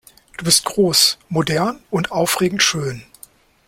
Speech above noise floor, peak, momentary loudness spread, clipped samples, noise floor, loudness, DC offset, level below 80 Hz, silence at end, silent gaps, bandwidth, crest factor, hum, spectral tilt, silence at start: 29 dB; 0 dBFS; 13 LU; under 0.1%; -47 dBFS; -17 LUFS; under 0.1%; -52 dBFS; 0.65 s; none; 16.5 kHz; 20 dB; none; -3 dB/octave; 0.4 s